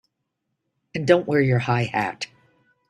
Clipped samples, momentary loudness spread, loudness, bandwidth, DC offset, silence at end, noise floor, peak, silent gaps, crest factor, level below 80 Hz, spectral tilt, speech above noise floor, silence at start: under 0.1%; 15 LU; -21 LUFS; 10.5 kHz; under 0.1%; 0.65 s; -78 dBFS; -2 dBFS; none; 22 dB; -60 dBFS; -6.5 dB/octave; 58 dB; 0.95 s